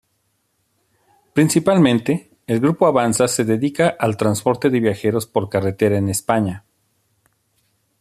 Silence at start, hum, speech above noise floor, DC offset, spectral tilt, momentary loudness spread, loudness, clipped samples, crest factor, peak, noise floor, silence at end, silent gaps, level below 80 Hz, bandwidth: 1.35 s; none; 51 dB; under 0.1%; -5.5 dB/octave; 8 LU; -18 LUFS; under 0.1%; 18 dB; 0 dBFS; -68 dBFS; 1.4 s; none; -58 dBFS; 14.5 kHz